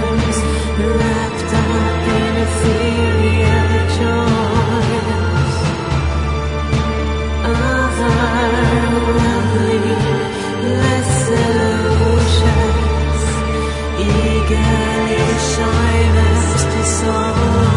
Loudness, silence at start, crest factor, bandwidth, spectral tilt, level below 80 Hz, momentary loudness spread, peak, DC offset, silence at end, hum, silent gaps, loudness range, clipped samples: -15 LUFS; 0 s; 14 dB; 11 kHz; -5.5 dB/octave; -24 dBFS; 5 LU; 0 dBFS; under 0.1%; 0 s; none; none; 2 LU; under 0.1%